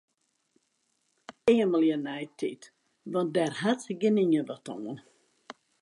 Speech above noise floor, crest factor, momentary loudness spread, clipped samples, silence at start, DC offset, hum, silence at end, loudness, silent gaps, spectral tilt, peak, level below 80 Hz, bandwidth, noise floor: 48 dB; 18 dB; 15 LU; under 0.1%; 1.3 s; under 0.1%; none; 0.3 s; -28 LUFS; none; -6 dB/octave; -12 dBFS; -74 dBFS; 11.5 kHz; -75 dBFS